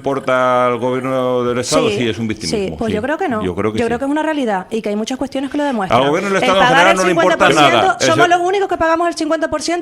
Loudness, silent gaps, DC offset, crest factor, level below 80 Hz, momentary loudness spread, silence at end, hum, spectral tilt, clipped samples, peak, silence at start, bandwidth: -15 LUFS; none; under 0.1%; 14 dB; -46 dBFS; 9 LU; 0 s; none; -4 dB/octave; under 0.1%; 0 dBFS; 0 s; 16 kHz